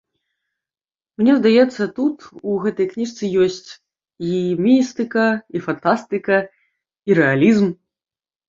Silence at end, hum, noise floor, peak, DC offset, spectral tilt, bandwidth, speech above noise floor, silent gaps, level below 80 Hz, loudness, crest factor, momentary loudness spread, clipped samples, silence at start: 0.75 s; none; under -90 dBFS; -2 dBFS; under 0.1%; -6.5 dB/octave; 7.6 kHz; over 73 dB; none; -62 dBFS; -18 LUFS; 18 dB; 11 LU; under 0.1%; 1.2 s